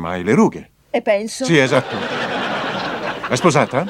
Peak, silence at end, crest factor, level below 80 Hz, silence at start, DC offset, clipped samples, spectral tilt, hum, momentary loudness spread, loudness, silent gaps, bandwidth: 0 dBFS; 0 s; 18 dB; -54 dBFS; 0 s; under 0.1%; under 0.1%; -5 dB/octave; none; 9 LU; -18 LUFS; none; 15.5 kHz